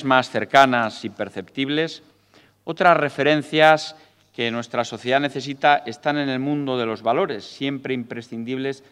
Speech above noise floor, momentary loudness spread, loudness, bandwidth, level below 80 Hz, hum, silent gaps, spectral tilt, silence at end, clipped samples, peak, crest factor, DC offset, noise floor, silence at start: 35 dB; 14 LU; -21 LUFS; 13.5 kHz; -70 dBFS; none; none; -5 dB/octave; 0.15 s; under 0.1%; 0 dBFS; 22 dB; under 0.1%; -56 dBFS; 0 s